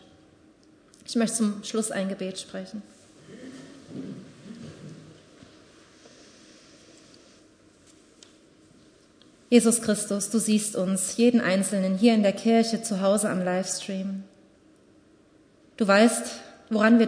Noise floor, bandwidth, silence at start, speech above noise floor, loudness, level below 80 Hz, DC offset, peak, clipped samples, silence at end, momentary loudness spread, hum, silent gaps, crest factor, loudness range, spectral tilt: -58 dBFS; 11 kHz; 1.1 s; 35 dB; -24 LUFS; -72 dBFS; under 0.1%; -6 dBFS; under 0.1%; 0 s; 23 LU; none; none; 22 dB; 21 LU; -4.5 dB/octave